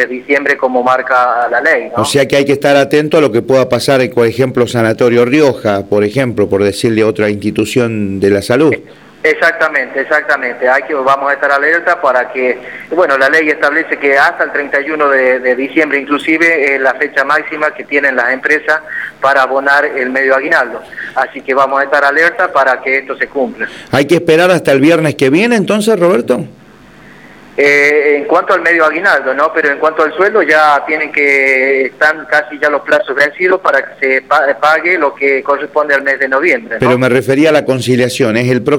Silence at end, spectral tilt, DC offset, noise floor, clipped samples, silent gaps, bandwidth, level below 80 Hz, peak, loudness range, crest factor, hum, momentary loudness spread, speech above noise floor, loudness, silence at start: 0 s; -5 dB/octave; 0.1%; -38 dBFS; under 0.1%; none; 17 kHz; -52 dBFS; 0 dBFS; 2 LU; 10 dB; none; 6 LU; 27 dB; -11 LUFS; 0 s